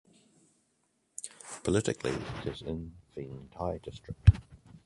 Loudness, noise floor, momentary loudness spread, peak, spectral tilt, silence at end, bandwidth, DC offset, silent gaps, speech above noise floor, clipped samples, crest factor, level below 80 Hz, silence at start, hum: -32 LUFS; -75 dBFS; 19 LU; -6 dBFS; -6 dB/octave; 0.1 s; 11.5 kHz; under 0.1%; none; 45 dB; under 0.1%; 26 dB; -38 dBFS; 1.25 s; none